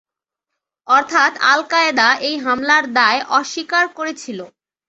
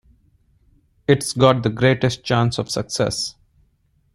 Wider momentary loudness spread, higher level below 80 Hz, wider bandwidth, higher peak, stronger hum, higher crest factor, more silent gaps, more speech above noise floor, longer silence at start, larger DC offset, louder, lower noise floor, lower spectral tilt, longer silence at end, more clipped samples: first, 12 LU vs 9 LU; second, -66 dBFS vs -50 dBFS; second, 8.2 kHz vs 13.5 kHz; about the same, 0 dBFS vs -2 dBFS; neither; about the same, 18 dB vs 20 dB; neither; first, 65 dB vs 44 dB; second, 0.9 s vs 1.1 s; neither; first, -15 LUFS vs -19 LUFS; first, -82 dBFS vs -63 dBFS; second, -1.5 dB/octave vs -5 dB/octave; second, 0.4 s vs 0.85 s; neither